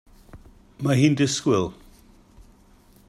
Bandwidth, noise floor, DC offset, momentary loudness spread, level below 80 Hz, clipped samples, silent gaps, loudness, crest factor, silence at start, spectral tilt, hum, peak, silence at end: 13 kHz; -54 dBFS; under 0.1%; 10 LU; -54 dBFS; under 0.1%; none; -22 LUFS; 20 dB; 0.35 s; -5.5 dB/octave; none; -6 dBFS; 1.35 s